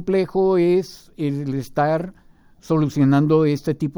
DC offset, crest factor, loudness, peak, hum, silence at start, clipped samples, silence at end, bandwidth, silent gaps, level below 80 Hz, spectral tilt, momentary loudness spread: under 0.1%; 14 dB; -20 LUFS; -4 dBFS; none; 0 s; under 0.1%; 0.05 s; over 20 kHz; none; -50 dBFS; -8 dB/octave; 9 LU